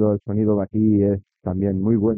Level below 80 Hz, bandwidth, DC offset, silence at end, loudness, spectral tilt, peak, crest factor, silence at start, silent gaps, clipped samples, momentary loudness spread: -52 dBFS; 2.6 kHz; under 0.1%; 0 s; -21 LUFS; -14.5 dB/octave; -6 dBFS; 14 dB; 0 s; none; under 0.1%; 7 LU